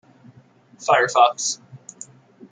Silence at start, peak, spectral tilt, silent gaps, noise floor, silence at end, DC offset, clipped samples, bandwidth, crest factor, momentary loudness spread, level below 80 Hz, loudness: 0.8 s; -2 dBFS; -1.5 dB/octave; none; -52 dBFS; 0.75 s; under 0.1%; under 0.1%; 9.6 kHz; 20 dB; 24 LU; -74 dBFS; -19 LUFS